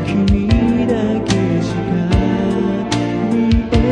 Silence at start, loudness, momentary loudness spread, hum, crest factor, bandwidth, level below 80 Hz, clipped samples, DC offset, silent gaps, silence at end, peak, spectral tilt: 0 s; -16 LUFS; 4 LU; none; 14 dB; 10 kHz; -24 dBFS; under 0.1%; under 0.1%; none; 0 s; 0 dBFS; -7 dB/octave